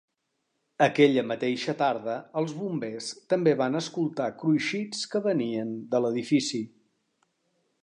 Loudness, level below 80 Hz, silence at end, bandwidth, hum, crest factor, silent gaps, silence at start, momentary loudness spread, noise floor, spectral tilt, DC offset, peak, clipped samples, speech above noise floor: -27 LUFS; -78 dBFS; 1.15 s; 11 kHz; none; 20 dB; none; 0.8 s; 10 LU; -78 dBFS; -5.5 dB/octave; under 0.1%; -6 dBFS; under 0.1%; 52 dB